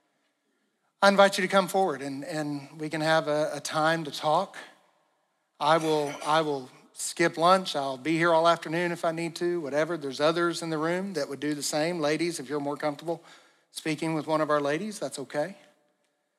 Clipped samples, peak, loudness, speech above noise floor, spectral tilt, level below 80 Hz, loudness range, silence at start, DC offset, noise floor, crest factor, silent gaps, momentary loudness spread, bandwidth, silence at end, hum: under 0.1%; -6 dBFS; -27 LUFS; 48 dB; -4.5 dB/octave; under -90 dBFS; 5 LU; 1 s; under 0.1%; -75 dBFS; 22 dB; none; 12 LU; 14.5 kHz; 0.85 s; none